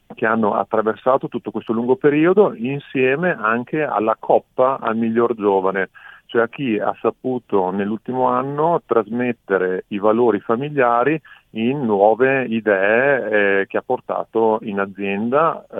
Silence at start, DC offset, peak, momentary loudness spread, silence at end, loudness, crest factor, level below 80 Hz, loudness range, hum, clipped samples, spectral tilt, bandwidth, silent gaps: 0.1 s; under 0.1%; 0 dBFS; 8 LU; 0 s; -19 LUFS; 18 dB; -68 dBFS; 3 LU; none; under 0.1%; -9.5 dB/octave; 3.9 kHz; none